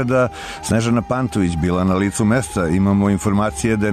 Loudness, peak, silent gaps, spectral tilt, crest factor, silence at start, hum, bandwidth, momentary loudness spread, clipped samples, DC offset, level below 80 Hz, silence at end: -18 LUFS; -6 dBFS; none; -6 dB/octave; 10 dB; 0 s; none; 13.5 kHz; 4 LU; under 0.1%; under 0.1%; -38 dBFS; 0 s